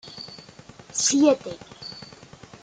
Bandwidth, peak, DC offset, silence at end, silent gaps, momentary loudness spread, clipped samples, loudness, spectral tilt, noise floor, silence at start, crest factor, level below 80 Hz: 9.6 kHz; -8 dBFS; under 0.1%; 0.6 s; none; 23 LU; under 0.1%; -21 LUFS; -2.5 dB/octave; -47 dBFS; 0.05 s; 20 dB; -64 dBFS